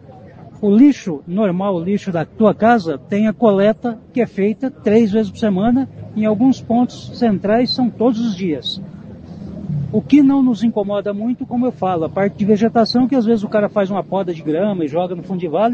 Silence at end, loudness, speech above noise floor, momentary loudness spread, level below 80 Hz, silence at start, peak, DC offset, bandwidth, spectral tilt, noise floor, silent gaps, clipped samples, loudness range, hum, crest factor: 0 s; -17 LUFS; 23 dB; 10 LU; -50 dBFS; 0.1 s; 0 dBFS; under 0.1%; 7.4 kHz; -7.5 dB/octave; -38 dBFS; none; under 0.1%; 2 LU; none; 16 dB